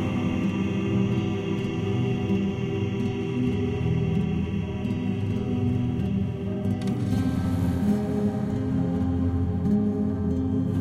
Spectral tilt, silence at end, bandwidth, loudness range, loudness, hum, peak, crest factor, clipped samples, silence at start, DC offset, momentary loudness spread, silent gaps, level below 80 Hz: -8.5 dB/octave; 0 s; 12.5 kHz; 1 LU; -26 LUFS; none; -14 dBFS; 12 dB; under 0.1%; 0 s; under 0.1%; 3 LU; none; -42 dBFS